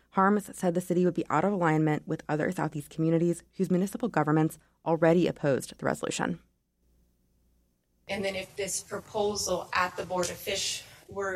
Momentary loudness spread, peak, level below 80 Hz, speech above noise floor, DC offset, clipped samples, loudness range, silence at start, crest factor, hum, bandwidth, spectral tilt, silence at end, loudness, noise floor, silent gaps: 8 LU; -12 dBFS; -62 dBFS; 43 dB; under 0.1%; under 0.1%; 7 LU; 0.15 s; 16 dB; 60 Hz at -55 dBFS; 15.5 kHz; -5 dB/octave; 0 s; -29 LUFS; -71 dBFS; none